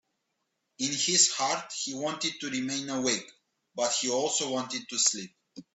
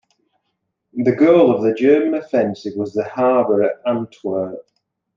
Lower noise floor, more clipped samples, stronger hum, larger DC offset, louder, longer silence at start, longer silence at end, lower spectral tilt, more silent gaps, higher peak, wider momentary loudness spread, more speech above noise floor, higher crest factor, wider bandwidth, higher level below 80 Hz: first, -80 dBFS vs -73 dBFS; neither; neither; neither; second, -28 LUFS vs -17 LUFS; second, 0.8 s vs 0.95 s; second, 0.15 s vs 0.55 s; second, -1 dB/octave vs -8 dB/octave; neither; second, -8 dBFS vs -2 dBFS; about the same, 11 LU vs 12 LU; second, 51 dB vs 57 dB; first, 22 dB vs 16 dB; first, 8.4 kHz vs 7.2 kHz; second, -76 dBFS vs -68 dBFS